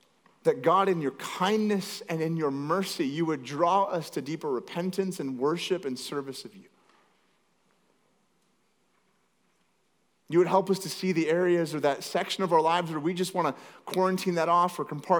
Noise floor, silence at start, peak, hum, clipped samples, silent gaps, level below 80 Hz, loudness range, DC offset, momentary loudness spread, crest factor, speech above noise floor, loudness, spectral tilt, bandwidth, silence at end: -72 dBFS; 0.45 s; -8 dBFS; none; under 0.1%; none; -90 dBFS; 8 LU; under 0.1%; 10 LU; 20 dB; 45 dB; -28 LUFS; -5.5 dB/octave; over 20 kHz; 0 s